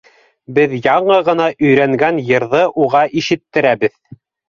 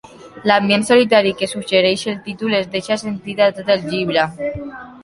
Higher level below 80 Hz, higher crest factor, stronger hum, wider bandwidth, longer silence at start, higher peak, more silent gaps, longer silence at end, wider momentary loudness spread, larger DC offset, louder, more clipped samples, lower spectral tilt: about the same, -56 dBFS vs -52 dBFS; about the same, 12 dB vs 16 dB; neither; second, 7.2 kHz vs 11.5 kHz; first, 0.5 s vs 0.05 s; about the same, -2 dBFS vs -2 dBFS; neither; first, 0.6 s vs 0 s; second, 5 LU vs 12 LU; neither; first, -14 LUFS vs -17 LUFS; neither; first, -6 dB/octave vs -4.5 dB/octave